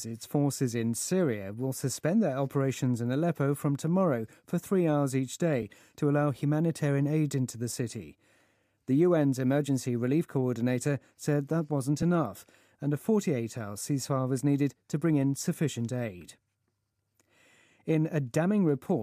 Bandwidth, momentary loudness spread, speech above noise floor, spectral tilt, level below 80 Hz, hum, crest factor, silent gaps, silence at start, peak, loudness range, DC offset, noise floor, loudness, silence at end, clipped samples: 15.5 kHz; 8 LU; 51 dB; -6.5 dB/octave; -70 dBFS; none; 16 dB; none; 0 s; -12 dBFS; 3 LU; under 0.1%; -79 dBFS; -29 LUFS; 0 s; under 0.1%